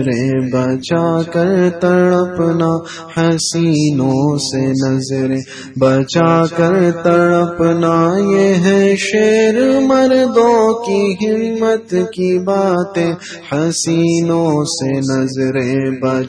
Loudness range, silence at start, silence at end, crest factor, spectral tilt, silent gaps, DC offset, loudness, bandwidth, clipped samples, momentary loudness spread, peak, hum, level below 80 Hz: 4 LU; 0 s; 0 s; 12 dB; -6 dB/octave; none; under 0.1%; -14 LUFS; 10.5 kHz; under 0.1%; 6 LU; 0 dBFS; none; -52 dBFS